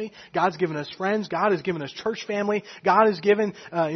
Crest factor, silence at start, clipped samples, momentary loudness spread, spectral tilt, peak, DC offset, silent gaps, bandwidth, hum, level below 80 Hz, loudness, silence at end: 20 dB; 0 s; under 0.1%; 10 LU; -6 dB/octave; -4 dBFS; under 0.1%; none; 6.4 kHz; none; -68 dBFS; -24 LUFS; 0 s